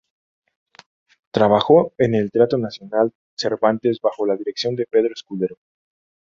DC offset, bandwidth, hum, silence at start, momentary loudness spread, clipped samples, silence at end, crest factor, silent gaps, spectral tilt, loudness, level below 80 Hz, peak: under 0.1%; 7.4 kHz; none; 1.35 s; 11 LU; under 0.1%; 0.75 s; 18 dB; 3.15-3.37 s; -6.5 dB/octave; -20 LUFS; -60 dBFS; -2 dBFS